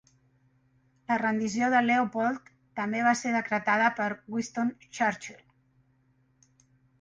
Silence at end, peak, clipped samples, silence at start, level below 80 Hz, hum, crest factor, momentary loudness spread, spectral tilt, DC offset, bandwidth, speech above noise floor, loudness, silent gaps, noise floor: 1.65 s; -12 dBFS; under 0.1%; 1.1 s; -72 dBFS; none; 18 dB; 13 LU; -4.5 dB/octave; under 0.1%; 9.8 kHz; 40 dB; -28 LUFS; none; -68 dBFS